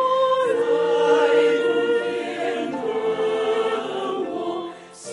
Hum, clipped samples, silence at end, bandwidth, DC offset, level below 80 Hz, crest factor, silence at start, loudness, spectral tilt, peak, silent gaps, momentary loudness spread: none; under 0.1%; 0 s; 11 kHz; under 0.1%; -72 dBFS; 14 dB; 0 s; -21 LUFS; -4 dB/octave; -6 dBFS; none; 9 LU